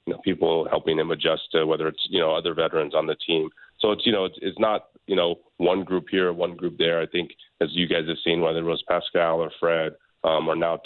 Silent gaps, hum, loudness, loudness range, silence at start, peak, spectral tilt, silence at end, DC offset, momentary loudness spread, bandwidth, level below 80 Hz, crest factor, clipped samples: none; none; -24 LUFS; 1 LU; 0.05 s; -8 dBFS; -9 dB/octave; 0.05 s; under 0.1%; 5 LU; 4.4 kHz; -60 dBFS; 16 dB; under 0.1%